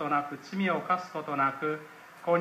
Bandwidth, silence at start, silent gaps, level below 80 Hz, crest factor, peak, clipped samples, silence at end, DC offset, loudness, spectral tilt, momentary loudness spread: 15.5 kHz; 0 s; none; -84 dBFS; 16 dB; -14 dBFS; under 0.1%; 0 s; under 0.1%; -31 LUFS; -6.5 dB/octave; 10 LU